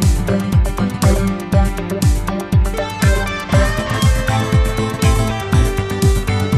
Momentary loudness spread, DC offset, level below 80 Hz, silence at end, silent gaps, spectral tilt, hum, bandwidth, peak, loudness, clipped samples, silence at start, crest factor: 3 LU; under 0.1%; -20 dBFS; 0 s; none; -6 dB/octave; none; 14 kHz; -2 dBFS; -17 LUFS; under 0.1%; 0 s; 14 dB